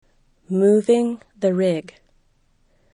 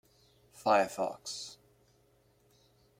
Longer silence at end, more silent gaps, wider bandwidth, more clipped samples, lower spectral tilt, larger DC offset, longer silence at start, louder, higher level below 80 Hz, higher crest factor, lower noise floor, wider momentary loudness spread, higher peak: second, 1.15 s vs 1.45 s; neither; second, 11 kHz vs 16.5 kHz; neither; first, -7 dB/octave vs -3 dB/octave; neither; about the same, 0.5 s vs 0.55 s; first, -20 LUFS vs -32 LUFS; first, -62 dBFS vs -76 dBFS; second, 16 dB vs 24 dB; second, -61 dBFS vs -68 dBFS; second, 10 LU vs 14 LU; first, -6 dBFS vs -12 dBFS